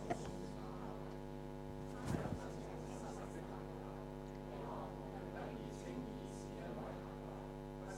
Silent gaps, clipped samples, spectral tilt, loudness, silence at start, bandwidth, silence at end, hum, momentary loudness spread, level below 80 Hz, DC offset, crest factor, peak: none; under 0.1%; -6.5 dB/octave; -48 LUFS; 0 s; 16 kHz; 0 s; none; 5 LU; -56 dBFS; under 0.1%; 20 dB; -26 dBFS